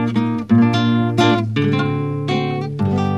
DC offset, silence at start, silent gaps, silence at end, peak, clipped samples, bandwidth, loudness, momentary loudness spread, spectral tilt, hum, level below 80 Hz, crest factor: 0.3%; 0 s; none; 0 s; -2 dBFS; under 0.1%; 11.5 kHz; -17 LUFS; 6 LU; -7 dB/octave; none; -52 dBFS; 16 dB